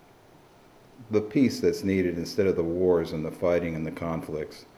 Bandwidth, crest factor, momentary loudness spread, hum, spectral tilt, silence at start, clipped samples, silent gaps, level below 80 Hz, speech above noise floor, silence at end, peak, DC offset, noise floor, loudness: 14.5 kHz; 16 dB; 9 LU; none; -6.5 dB/octave; 1 s; under 0.1%; none; -54 dBFS; 29 dB; 0.15 s; -10 dBFS; under 0.1%; -55 dBFS; -27 LUFS